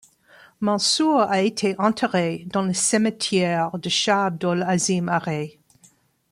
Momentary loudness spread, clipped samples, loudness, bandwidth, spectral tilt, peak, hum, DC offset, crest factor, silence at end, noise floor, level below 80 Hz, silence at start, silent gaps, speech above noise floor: 6 LU; under 0.1%; -21 LUFS; 15.5 kHz; -4 dB/octave; -6 dBFS; none; under 0.1%; 16 dB; 0.8 s; -58 dBFS; -66 dBFS; 0.6 s; none; 36 dB